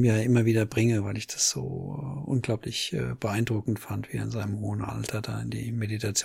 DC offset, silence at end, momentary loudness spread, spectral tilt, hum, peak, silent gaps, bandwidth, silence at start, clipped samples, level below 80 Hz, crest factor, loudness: under 0.1%; 0 s; 10 LU; -5 dB/octave; none; -10 dBFS; none; 16 kHz; 0 s; under 0.1%; -54 dBFS; 18 dB; -28 LUFS